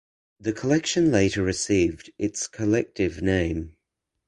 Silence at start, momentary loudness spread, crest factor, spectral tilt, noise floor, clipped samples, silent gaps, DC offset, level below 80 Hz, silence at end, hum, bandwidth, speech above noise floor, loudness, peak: 0.4 s; 10 LU; 18 dB; -5 dB/octave; -81 dBFS; under 0.1%; none; under 0.1%; -44 dBFS; 0.55 s; none; 11.5 kHz; 57 dB; -24 LUFS; -6 dBFS